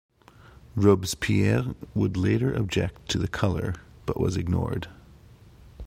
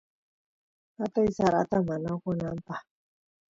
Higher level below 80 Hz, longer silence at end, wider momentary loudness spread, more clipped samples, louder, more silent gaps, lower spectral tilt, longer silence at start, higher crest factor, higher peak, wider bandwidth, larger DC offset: first, -44 dBFS vs -58 dBFS; second, 0 s vs 0.7 s; about the same, 12 LU vs 13 LU; neither; first, -26 LUFS vs -29 LUFS; neither; second, -6 dB/octave vs -7.5 dB/octave; second, 0.75 s vs 1 s; about the same, 20 dB vs 20 dB; first, -6 dBFS vs -12 dBFS; first, 16 kHz vs 7.8 kHz; neither